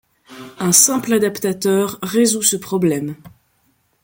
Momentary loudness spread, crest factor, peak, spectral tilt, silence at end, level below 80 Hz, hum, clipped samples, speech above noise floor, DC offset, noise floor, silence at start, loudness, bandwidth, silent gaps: 12 LU; 18 dB; 0 dBFS; -3.5 dB/octave; 0.75 s; -58 dBFS; none; under 0.1%; 45 dB; under 0.1%; -62 dBFS; 0.3 s; -16 LUFS; 17 kHz; none